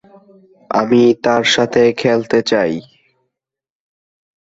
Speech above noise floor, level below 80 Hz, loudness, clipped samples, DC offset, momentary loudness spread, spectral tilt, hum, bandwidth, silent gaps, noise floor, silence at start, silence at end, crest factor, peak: 66 dB; -56 dBFS; -14 LUFS; under 0.1%; under 0.1%; 8 LU; -4.5 dB/octave; none; 8 kHz; none; -79 dBFS; 0.7 s; 1.6 s; 14 dB; -2 dBFS